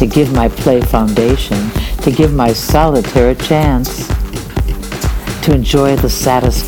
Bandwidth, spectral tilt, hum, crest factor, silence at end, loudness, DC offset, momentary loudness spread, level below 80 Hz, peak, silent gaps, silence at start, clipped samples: 19.5 kHz; -6 dB/octave; none; 12 dB; 0 s; -13 LUFS; under 0.1%; 8 LU; -18 dBFS; 0 dBFS; none; 0 s; 0.2%